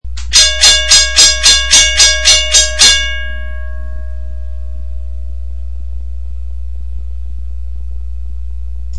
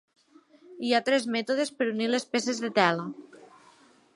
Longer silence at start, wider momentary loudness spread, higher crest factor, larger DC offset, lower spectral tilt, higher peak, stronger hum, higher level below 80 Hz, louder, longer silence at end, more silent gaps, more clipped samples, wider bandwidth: second, 0 s vs 0.7 s; first, 21 LU vs 10 LU; second, 14 dB vs 22 dB; first, 9% vs under 0.1%; second, 0.5 dB/octave vs -4 dB/octave; first, 0 dBFS vs -6 dBFS; neither; first, -22 dBFS vs -80 dBFS; first, -6 LUFS vs -27 LUFS; second, 0 s vs 0.7 s; neither; first, 1% vs under 0.1%; about the same, 12 kHz vs 11.5 kHz